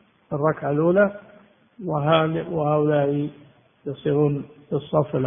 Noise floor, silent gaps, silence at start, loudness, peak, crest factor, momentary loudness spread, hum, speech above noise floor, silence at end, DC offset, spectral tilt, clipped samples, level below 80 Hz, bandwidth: -53 dBFS; none; 0.3 s; -22 LUFS; -4 dBFS; 20 dB; 13 LU; none; 31 dB; 0 s; under 0.1%; -12 dB/octave; under 0.1%; -58 dBFS; 3.7 kHz